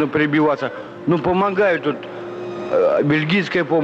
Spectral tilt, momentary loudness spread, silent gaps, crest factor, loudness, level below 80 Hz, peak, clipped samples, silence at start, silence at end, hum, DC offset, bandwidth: -7.5 dB/octave; 12 LU; none; 10 dB; -19 LUFS; -54 dBFS; -8 dBFS; under 0.1%; 0 s; 0 s; none; under 0.1%; 7.8 kHz